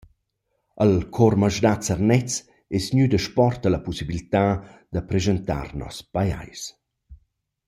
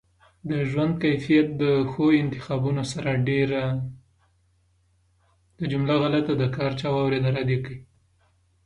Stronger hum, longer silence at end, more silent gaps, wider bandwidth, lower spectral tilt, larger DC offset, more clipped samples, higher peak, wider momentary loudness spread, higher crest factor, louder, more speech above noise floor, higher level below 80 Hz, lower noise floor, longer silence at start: neither; second, 0.5 s vs 0.8 s; neither; first, 15 kHz vs 11 kHz; second, -6 dB/octave vs -7.5 dB/octave; neither; neither; first, -4 dBFS vs -8 dBFS; first, 12 LU vs 9 LU; about the same, 20 dB vs 16 dB; about the same, -23 LUFS vs -24 LUFS; first, 53 dB vs 41 dB; first, -44 dBFS vs -54 dBFS; first, -75 dBFS vs -65 dBFS; first, 0.75 s vs 0.45 s